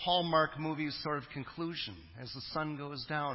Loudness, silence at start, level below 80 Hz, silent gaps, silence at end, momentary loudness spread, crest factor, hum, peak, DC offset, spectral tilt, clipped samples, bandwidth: -36 LUFS; 0 s; -62 dBFS; none; 0 s; 14 LU; 20 dB; none; -16 dBFS; under 0.1%; -8.5 dB/octave; under 0.1%; 5.8 kHz